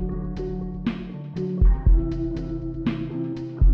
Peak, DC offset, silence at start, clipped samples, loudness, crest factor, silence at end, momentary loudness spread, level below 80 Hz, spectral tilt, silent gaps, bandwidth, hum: -8 dBFS; under 0.1%; 0 s; under 0.1%; -26 LUFS; 14 dB; 0 s; 9 LU; -24 dBFS; -10 dB/octave; none; 4.9 kHz; none